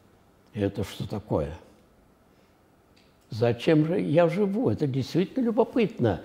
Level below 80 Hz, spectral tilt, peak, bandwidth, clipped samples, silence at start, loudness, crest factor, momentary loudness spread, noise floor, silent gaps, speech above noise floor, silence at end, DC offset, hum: -54 dBFS; -8 dB/octave; -8 dBFS; 15.5 kHz; under 0.1%; 0.55 s; -26 LUFS; 20 dB; 12 LU; -60 dBFS; none; 35 dB; 0 s; under 0.1%; none